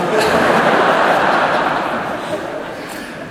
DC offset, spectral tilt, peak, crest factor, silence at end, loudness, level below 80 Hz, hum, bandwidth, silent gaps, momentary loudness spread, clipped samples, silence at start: under 0.1%; -4.5 dB/octave; 0 dBFS; 16 dB; 0 s; -15 LUFS; -48 dBFS; none; 16 kHz; none; 14 LU; under 0.1%; 0 s